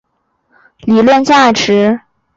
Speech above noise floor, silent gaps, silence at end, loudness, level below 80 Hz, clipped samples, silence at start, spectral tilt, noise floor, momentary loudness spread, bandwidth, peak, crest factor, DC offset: 53 dB; none; 0.4 s; -10 LUFS; -50 dBFS; under 0.1%; 0.85 s; -4.5 dB/octave; -62 dBFS; 11 LU; 7.8 kHz; -2 dBFS; 10 dB; under 0.1%